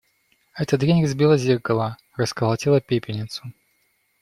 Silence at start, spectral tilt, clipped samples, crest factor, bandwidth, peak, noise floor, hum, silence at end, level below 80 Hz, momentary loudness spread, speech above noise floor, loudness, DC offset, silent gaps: 0.55 s; -6.5 dB/octave; under 0.1%; 18 dB; 14 kHz; -6 dBFS; -67 dBFS; none; 0.7 s; -56 dBFS; 14 LU; 46 dB; -21 LUFS; under 0.1%; none